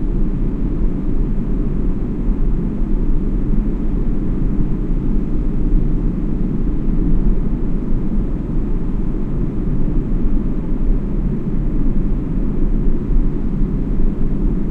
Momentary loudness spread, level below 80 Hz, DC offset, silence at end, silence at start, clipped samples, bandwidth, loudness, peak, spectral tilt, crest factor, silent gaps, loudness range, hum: 2 LU; -16 dBFS; under 0.1%; 0 s; 0 s; under 0.1%; 2.6 kHz; -21 LUFS; -4 dBFS; -11 dB/octave; 12 dB; none; 1 LU; none